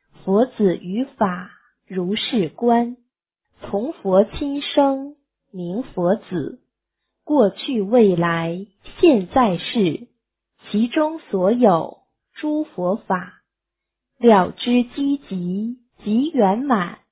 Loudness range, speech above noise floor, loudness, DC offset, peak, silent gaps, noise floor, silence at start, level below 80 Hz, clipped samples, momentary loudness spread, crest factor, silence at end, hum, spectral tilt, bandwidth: 4 LU; 64 dB; -20 LUFS; under 0.1%; -2 dBFS; none; -83 dBFS; 0.25 s; -54 dBFS; under 0.1%; 13 LU; 18 dB; 0.15 s; none; -11 dB/octave; 4 kHz